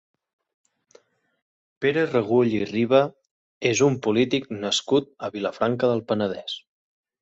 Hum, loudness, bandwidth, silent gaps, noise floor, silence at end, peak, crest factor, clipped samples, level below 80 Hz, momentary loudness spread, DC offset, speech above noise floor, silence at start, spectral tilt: none; -23 LUFS; 8.2 kHz; 3.31-3.61 s; -58 dBFS; 0.65 s; -6 dBFS; 18 dB; under 0.1%; -64 dBFS; 9 LU; under 0.1%; 36 dB; 1.8 s; -5 dB/octave